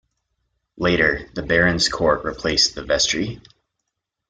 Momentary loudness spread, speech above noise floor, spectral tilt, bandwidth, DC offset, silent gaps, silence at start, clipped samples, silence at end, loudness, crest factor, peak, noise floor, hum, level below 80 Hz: 7 LU; 59 dB; -3 dB/octave; 10 kHz; under 0.1%; none; 0.75 s; under 0.1%; 0.9 s; -19 LUFS; 20 dB; -2 dBFS; -79 dBFS; none; -42 dBFS